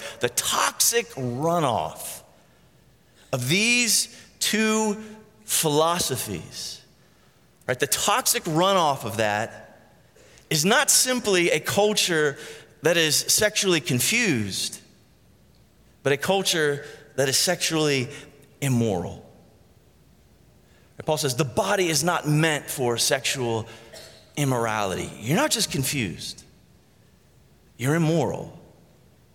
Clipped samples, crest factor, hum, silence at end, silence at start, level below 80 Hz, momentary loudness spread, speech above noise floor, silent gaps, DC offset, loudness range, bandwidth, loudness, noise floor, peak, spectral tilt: under 0.1%; 20 dB; none; 0.75 s; 0 s; -60 dBFS; 15 LU; 35 dB; none; under 0.1%; 6 LU; 17 kHz; -22 LUFS; -58 dBFS; -6 dBFS; -3 dB/octave